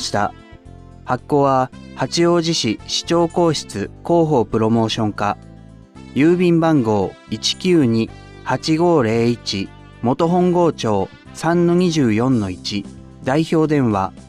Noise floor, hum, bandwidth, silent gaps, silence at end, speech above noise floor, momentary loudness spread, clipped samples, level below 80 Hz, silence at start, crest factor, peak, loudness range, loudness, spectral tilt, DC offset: -40 dBFS; none; 12 kHz; none; 0.1 s; 23 dB; 11 LU; under 0.1%; -46 dBFS; 0 s; 14 dB; -4 dBFS; 1 LU; -18 LUFS; -5.5 dB/octave; under 0.1%